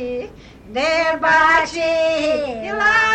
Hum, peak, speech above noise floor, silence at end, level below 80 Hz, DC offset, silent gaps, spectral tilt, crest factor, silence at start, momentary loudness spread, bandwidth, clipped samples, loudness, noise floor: none; -2 dBFS; 21 dB; 0 s; -46 dBFS; under 0.1%; none; -3 dB/octave; 14 dB; 0 s; 14 LU; 9.2 kHz; under 0.1%; -17 LUFS; -37 dBFS